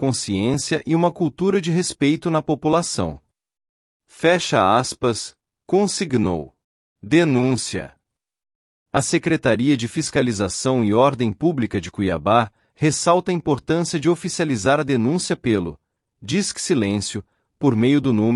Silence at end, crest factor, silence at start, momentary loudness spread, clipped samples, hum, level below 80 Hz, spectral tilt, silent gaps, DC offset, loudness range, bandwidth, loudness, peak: 0 s; 18 dB; 0 s; 8 LU; under 0.1%; none; -52 dBFS; -5 dB/octave; 3.69-4.00 s, 6.64-6.96 s, 8.55-8.86 s; under 0.1%; 2 LU; 12 kHz; -20 LUFS; -4 dBFS